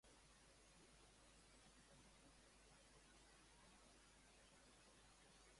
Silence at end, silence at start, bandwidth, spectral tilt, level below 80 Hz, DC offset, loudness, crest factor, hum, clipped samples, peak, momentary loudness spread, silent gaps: 0 s; 0.05 s; 11.5 kHz; -2.5 dB/octave; -78 dBFS; under 0.1%; -69 LUFS; 14 dB; none; under 0.1%; -58 dBFS; 1 LU; none